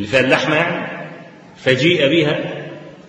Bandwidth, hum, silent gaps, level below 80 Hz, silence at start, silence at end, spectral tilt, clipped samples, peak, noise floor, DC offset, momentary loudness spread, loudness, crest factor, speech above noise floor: 10 kHz; none; none; -54 dBFS; 0 s; 0 s; -5.5 dB/octave; under 0.1%; 0 dBFS; -37 dBFS; under 0.1%; 17 LU; -16 LUFS; 18 dB; 22 dB